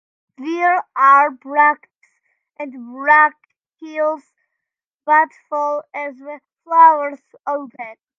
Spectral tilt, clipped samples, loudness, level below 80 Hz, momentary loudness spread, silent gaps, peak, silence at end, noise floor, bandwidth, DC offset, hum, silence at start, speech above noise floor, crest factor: -3.5 dB/octave; under 0.1%; -15 LUFS; -86 dBFS; 20 LU; 4.93-4.99 s; 0 dBFS; 0.25 s; -84 dBFS; 7 kHz; under 0.1%; none; 0.4 s; 67 dB; 18 dB